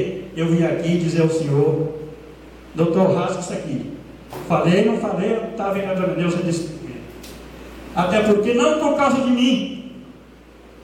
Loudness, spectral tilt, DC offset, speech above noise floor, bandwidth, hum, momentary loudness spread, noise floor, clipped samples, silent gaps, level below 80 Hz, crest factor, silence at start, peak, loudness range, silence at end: -20 LUFS; -6.5 dB/octave; under 0.1%; 26 dB; 15.5 kHz; none; 20 LU; -44 dBFS; under 0.1%; none; -48 dBFS; 16 dB; 0 s; -4 dBFS; 3 LU; 0 s